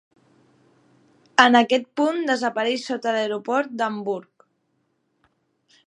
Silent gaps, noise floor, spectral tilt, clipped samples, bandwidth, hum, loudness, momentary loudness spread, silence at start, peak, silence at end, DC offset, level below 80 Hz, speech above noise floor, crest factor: none; -70 dBFS; -3.5 dB/octave; under 0.1%; 10.5 kHz; none; -21 LUFS; 11 LU; 1.4 s; 0 dBFS; 1.65 s; under 0.1%; -74 dBFS; 49 dB; 24 dB